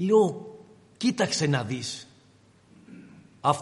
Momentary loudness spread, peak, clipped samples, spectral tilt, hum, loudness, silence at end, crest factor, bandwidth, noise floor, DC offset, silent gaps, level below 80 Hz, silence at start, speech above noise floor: 25 LU; -8 dBFS; under 0.1%; -5 dB/octave; none; -26 LUFS; 0 s; 20 dB; 11.5 kHz; -58 dBFS; under 0.1%; none; -70 dBFS; 0 s; 34 dB